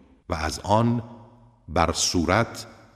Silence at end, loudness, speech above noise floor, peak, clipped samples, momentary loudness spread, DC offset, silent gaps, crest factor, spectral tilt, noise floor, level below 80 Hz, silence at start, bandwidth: 0.25 s; -24 LUFS; 28 dB; -2 dBFS; under 0.1%; 11 LU; under 0.1%; none; 22 dB; -4.5 dB/octave; -51 dBFS; -42 dBFS; 0.3 s; 15.5 kHz